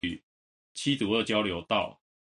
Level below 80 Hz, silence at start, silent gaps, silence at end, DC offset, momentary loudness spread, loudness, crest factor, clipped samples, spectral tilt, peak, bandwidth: -58 dBFS; 0.05 s; 0.23-0.75 s; 0.35 s; under 0.1%; 14 LU; -29 LUFS; 20 dB; under 0.1%; -4.5 dB/octave; -10 dBFS; 11.5 kHz